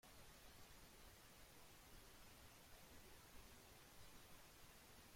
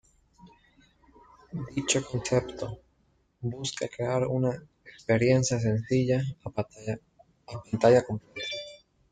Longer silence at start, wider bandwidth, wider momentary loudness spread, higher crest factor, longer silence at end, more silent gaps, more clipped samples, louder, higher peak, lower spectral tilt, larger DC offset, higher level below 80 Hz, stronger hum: second, 0.05 s vs 0.45 s; first, 16.5 kHz vs 9.6 kHz; second, 1 LU vs 17 LU; second, 14 dB vs 22 dB; second, 0 s vs 0.35 s; neither; neither; second, -64 LUFS vs -28 LUFS; second, -50 dBFS vs -8 dBFS; second, -2.5 dB/octave vs -5.5 dB/octave; neither; second, -72 dBFS vs -58 dBFS; neither